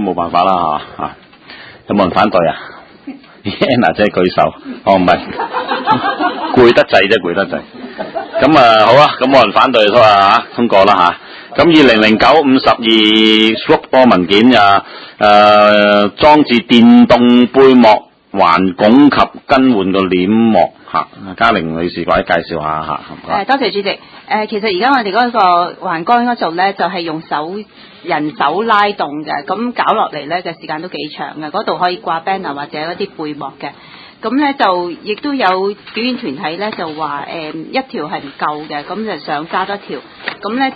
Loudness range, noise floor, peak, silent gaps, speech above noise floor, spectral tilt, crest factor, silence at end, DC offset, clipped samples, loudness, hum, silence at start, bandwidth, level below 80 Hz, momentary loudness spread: 11 LU; -35 dBFS; 0 dBFS; none; 24 dB; -6 dB/octave; 12 dB; 0 s; under 0.1%; 0.5%; -11 LUFS; none; 0 s; 8 kHz; -44 dBFS; 15 LU